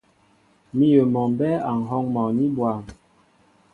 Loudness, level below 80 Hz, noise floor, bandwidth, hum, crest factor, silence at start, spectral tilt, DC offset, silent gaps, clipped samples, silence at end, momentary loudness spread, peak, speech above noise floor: -22 LUFS; -58 dBFS; -60 dBFS; 6.6 kHz; none; 18 dB; 0.75 s; -9.5 dB/octave; under 0.1%; none; under 0.1%; 0.8 s; 9 LU; -4 dBFS; 39 dB